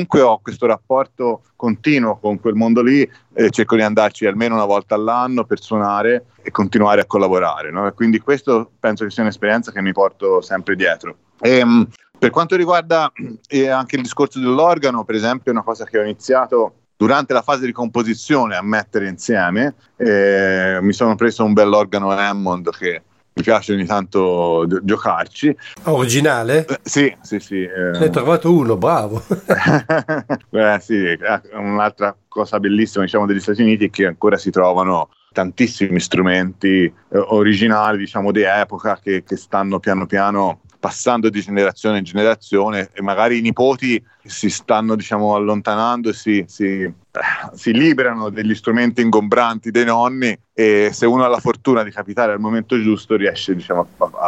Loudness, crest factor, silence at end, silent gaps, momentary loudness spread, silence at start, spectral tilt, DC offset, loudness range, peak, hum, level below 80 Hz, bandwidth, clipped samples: -16 LUFS; 16 dB; 0 s; none; 8 LU; 0 s; -5.5 dB/octave; under 0.1%; 2 LU; 0 dBFS; none; -58 dBFS; 14 kHz; under 0.1%